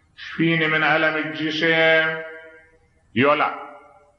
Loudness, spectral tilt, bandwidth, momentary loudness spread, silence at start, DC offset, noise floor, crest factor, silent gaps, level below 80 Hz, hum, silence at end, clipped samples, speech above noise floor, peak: -19 LUFS; -6 dB/octave; 7 kHz; 15 LU; 0.2 s; under 0.1%; -57 dBFS; 16 dB; none; -66 dBFS; none; 0.4 s; under 0.1%; 37 dB; -6 dBFS